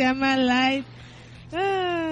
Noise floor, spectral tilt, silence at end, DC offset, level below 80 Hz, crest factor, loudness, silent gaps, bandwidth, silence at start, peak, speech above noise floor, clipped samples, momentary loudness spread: -44 dBFS; -4.5 dB/octave; 0 s; under 0.1%; -54 dBFS; 14 dB; -23 LUFS; none; 8 kHz; 0 s; -10 dBFS; 21 dB; under 0.1%; 17 LU